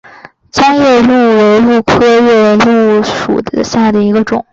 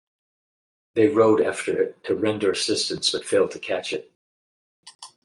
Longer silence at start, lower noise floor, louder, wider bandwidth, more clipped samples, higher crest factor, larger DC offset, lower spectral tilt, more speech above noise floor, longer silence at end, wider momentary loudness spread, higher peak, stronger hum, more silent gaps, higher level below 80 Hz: second, 0.55 s vs 0.95 s; second, -36 dBFS vs under -90 dBFS; first, -8 LUFS vs -23 LUFS; second, 7.8 kHz vs 11.5 kHz; neither; second, 8 dB vs 18 dB; neither; first, -5.5 dB/octave vs -3.5 dB/octave; second, 27 dB vs over 68 dB; second, 0.1 s vs 0.25 s; second, 7 LU vs 12 LU; first, 0 dBFS vs -6 dBFS; neither; second, none vs 4.15-4.83 s, 4.95-4.99 s; first, -40 dBFS vs -68 dBFS